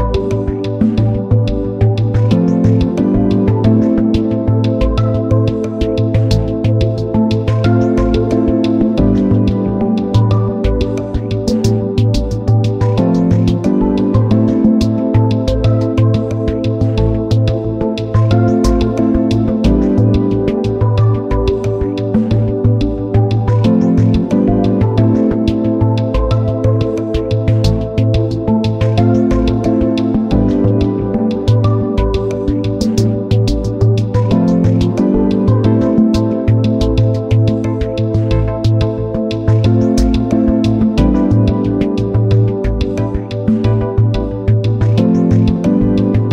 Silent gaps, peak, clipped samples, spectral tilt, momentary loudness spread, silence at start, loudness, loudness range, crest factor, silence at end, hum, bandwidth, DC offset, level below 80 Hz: none; 0 dBFS; under 0.1%; -8.5 dB/octave; 4 LU; 0 s; -13 LUFS; 2 LU; 12 dB; 0 s; none; 8 kHz; under 0.1%; -24 dBFS